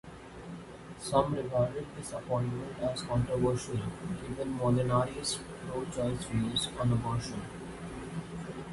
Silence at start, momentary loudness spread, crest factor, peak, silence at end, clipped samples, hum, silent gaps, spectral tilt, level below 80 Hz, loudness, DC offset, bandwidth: 0.05 s; 13 LU; 20 dB; -12 dBFS; 0 s; under 0.1%; none; none; -5.5 dB/octave; -52 dBFS; -33 LUFS; under 0.1%; 11.5 kHz